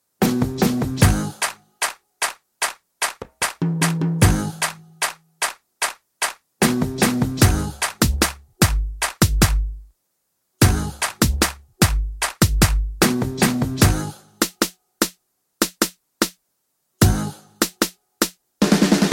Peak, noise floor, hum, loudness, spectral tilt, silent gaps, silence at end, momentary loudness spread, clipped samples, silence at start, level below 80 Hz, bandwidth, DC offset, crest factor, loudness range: 0 dBFS; -72 dBFS; none; -21 LUFS; -4 dB/octave; none; 0 s; 8 LU; under 0.1%; 0.2 s; -28 dBFS; 17 kHz; under 0.1%; 20 dB; 3 LU